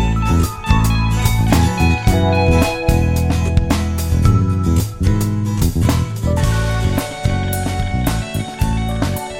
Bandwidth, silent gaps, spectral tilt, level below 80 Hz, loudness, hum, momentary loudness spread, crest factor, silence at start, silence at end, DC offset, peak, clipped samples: 17 kHz; none; -6 dB/octave; -22 dBFS; -17 LUFS; none; 5 LU; 14 dB; 0 s; 0 s; under 0.1%; 0 dBFS; under 0.1%